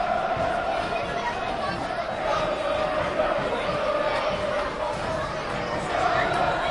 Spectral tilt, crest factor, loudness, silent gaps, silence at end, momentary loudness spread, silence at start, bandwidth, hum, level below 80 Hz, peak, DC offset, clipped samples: -5 dB/octave; 16 dB; -26 LUFS; none; 0 s; 5 LU; 0 s; 11.5 kHz; none; -44 dBFS; -10 dBFS; under 0.1%; under 0.1%